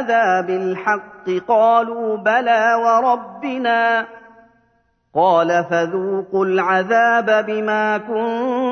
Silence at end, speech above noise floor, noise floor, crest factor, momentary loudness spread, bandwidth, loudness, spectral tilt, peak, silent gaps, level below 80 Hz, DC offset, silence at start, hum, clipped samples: 0 s; 45 dB; -62 dBFS; 14 dB; 8 LU; 6.6 kHz; -17 LUFS; -5.5 dB/octave; -2 dBFS; none; -68 dBFS; under 0.1%; 0 s; none; under 0.1%